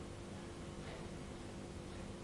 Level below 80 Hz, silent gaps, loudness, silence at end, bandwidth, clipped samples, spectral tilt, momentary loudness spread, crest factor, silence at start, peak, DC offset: -58 dBFS; none; -49 LUFS; 0 s; 11.5 kHz; under 0.1%; -5.5 dB/octave; 1 LU; 12 dB; 0 s; -36 dBFS; under 0.1%